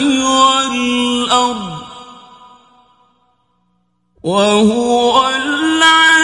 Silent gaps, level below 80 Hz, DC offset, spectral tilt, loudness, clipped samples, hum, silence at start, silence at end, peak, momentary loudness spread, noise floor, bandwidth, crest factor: none; -50 dBFS; under 0.1%; -2.5 dB/octave; -12 LUFS; under 0.1%; 60 Hz at -55 dBFS; 0 s; 0 s; 0 dBFS; 15 LU; -62 dBFS; 11.5 kHz; 14 dB